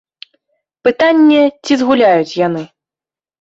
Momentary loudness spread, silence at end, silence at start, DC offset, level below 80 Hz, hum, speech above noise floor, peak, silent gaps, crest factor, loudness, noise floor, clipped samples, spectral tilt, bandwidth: 8 LU; 0.75 s; 0.85 s; under 0.1%; -58 dBFS; none; over 79 dB; -2 dBFS; none; 12 dB; -12 LUFS; under -90 dBFS; under 0.1%; -5.5 dB/octave; 7.8 kHz